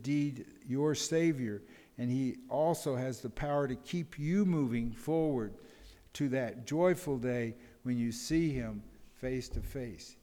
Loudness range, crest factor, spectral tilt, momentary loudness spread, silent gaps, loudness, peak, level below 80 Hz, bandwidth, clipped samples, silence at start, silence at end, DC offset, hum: 1 LU; 16 dB; -6 dB/octave; 12 LU; none; -34 LUFS; -18 dBFS; -52 dBFS; 19.5 kHz; under 0.1%; 0 s; 0.1 s; under 0.1%; none